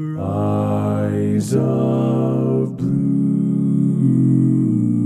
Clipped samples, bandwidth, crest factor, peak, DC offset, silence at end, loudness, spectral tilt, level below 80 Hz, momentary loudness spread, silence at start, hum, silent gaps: under 0.1%; 12 kHz; 12 dB; -4 dBFS; under 0.1%; 0 s; -18 LUFS; -9.5 dB/octave; -58 dBFS; 4 LU; 0 s; none; none